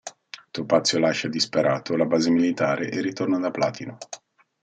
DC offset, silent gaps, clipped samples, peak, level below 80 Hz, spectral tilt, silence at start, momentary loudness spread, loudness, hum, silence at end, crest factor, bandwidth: under 0.1%; none; under 0.1%; -6 dBFS; -70 dBFS; -4.5 dB/octave; 0.05 s; 18 LU; -23 LUFS; none; 0.45 s; 18 dB; 9.4 kHz